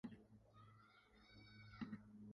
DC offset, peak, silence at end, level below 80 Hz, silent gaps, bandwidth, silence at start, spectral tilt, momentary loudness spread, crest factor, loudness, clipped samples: under 0.1%; -38 dBFS; 0 s; -78 dBFS; none; 11 kHz; 0.05 s; -7 dB/octave; 15 LU; 22 dB; -60 LUFS; under 0.1%